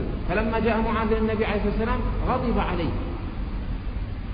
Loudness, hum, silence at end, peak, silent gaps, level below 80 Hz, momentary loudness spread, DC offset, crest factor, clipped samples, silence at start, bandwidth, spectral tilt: -26 LUFS; none; 0 s; -10 dBFS; none; -30 dBFS; 9 LU; under 0.1%; 14 dB; under 0.1%; 0 s; 5.2 kHz; -11.5 dB/octave